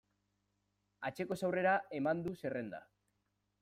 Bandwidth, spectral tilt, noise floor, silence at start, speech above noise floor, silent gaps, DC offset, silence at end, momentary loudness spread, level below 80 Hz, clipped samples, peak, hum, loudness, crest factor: 15.5 kHz; -6.5 dB/octave; -83 dBFS; 1 s; 46 dB; none; under 0.1%; 0.8 s; 12 LU; -76 dBFS; under 0.1%; -22 dBFS; 50 Hz at -70 dBFS; -37 LUFS; 18 dB